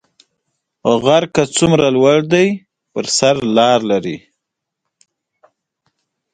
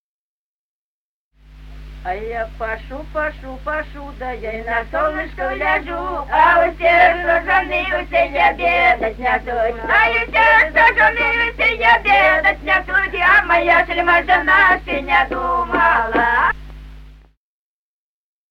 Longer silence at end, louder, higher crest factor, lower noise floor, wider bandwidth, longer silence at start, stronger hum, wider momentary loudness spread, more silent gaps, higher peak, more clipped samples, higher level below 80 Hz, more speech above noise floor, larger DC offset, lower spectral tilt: first, 2.15 s vs 1.35 s; about the same, -14 LUFS vs -15 LUFS; about the same, 16 dB vs 16 dB; second, -78 dBFS vs under -90 dBFS; second, 9.6 kHz vs 13.5 kHz; second, 0.85 s vs 1.5 s; neither; about the same, 14 LU vs 14 LU; neither; about the same, 0 dBFS vs -2 dBFS; neither; second, -52 dBFS vs -34 dBFS; second, 65 dB vs over 74 dB; neither; about the same, -4.5 dB/octave vs -5 dB/octave